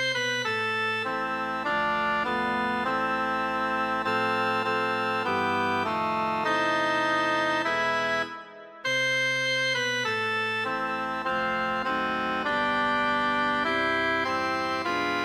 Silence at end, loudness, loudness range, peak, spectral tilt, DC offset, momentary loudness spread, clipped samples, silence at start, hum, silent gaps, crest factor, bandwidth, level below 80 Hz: 0 s; -26 LUFS; 1 LU; -14 dBFS; -3.5 dB/octave; under 0.1%; 4 LU; under 0.1%; 0 s; none; none; 12 dB; 16 kHz; -60 dBFS